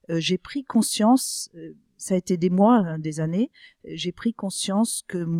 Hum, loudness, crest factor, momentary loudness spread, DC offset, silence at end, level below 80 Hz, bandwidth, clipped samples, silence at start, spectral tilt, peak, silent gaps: none; -23 LUFS; 18 dB; 13 LU; under 0.1%; 0 s; -62 dBFS; 16 kHz; under 0.1%; 0.1 s; -5 dB/octave; -6 dBFS; none